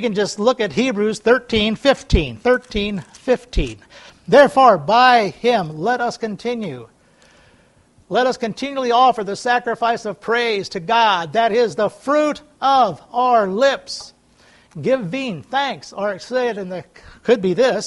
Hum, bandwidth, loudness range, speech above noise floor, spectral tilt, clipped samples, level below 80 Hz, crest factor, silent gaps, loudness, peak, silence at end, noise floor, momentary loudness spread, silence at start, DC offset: none; 11.5 kHz; 7 LU; 36 dB; -5 dB/octave; under 0.1%; -36 dBFS; 18 dB; none; -18 LUFS; 0 dBFS; 0 s; -54 dBFS; 12 LU; 0 s; under 0.1%